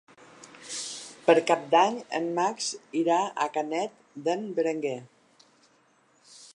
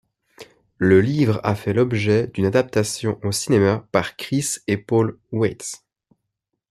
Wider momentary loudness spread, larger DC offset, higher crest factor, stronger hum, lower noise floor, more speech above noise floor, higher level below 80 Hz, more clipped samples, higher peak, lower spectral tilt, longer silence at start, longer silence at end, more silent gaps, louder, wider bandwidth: first, 13 LU vs 8 LU; neither; about the same, 22 dB vs 18 dB; neither; second, -64 dBFS vs -78 dBFS; second, 38 dB vs 59 dB; second, -82 dBFS vs -56 dBFS; neither; second, -6 dBFS vs -2 dBFS; second, -3.5 dB/octave vs -5.5 dB/octave; about the same, 0.4 s vs 0.4 s; second, 0.1 s vs 0.95 s; neither; second, -27 LUFS vs -20 LUFS; second, 11 kHz vs 14 kHz